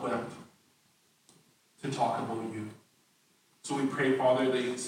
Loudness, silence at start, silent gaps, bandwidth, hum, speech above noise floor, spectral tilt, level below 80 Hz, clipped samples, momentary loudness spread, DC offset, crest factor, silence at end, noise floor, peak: -31 LUFS; 0 s; none; 16 kHz; none; 39 dB; -5 dB/octave; -80 dBFS; under 0.1%; 18 LU; under 0.1%; 18 dB; 0 s; -68 dBFS; -14 dBFS